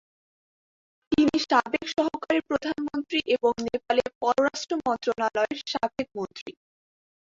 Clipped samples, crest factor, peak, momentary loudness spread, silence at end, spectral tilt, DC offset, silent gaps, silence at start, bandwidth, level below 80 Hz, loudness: under 0.1%; 20 dB; -8 dBFS; 8 LU; 0.9 s; -4 dB/octave; under 0.1%; 4.15-4.21 s, 6.41-6.46 s; 1.1 s; 7.8 kHz; -60 dBFS; -26 LUFS